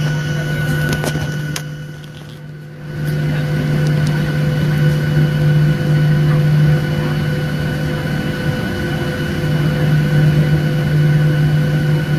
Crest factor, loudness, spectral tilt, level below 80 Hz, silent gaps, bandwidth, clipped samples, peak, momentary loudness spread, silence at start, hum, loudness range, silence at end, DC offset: 14 dB; -16 LUFS; -7 dB/octave; -34 dBFS; none; 13.5 kHz; under 0.1%; -2 dBFS; 11 LU; 0 s; none; 6 LU; 0 s; under 0.1%